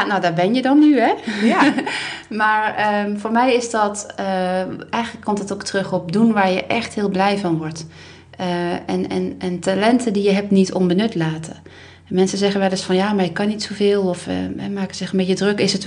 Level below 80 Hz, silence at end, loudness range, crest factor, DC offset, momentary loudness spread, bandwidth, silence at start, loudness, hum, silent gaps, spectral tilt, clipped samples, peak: -58 dBFS; 0 s; 4 LU; 18 dB; under 0.1%; 9 LU; 10 kHz; 0 s; -19 LUFS; none; none; -5.5 dB/octave; under 0.1%; -2 dBFS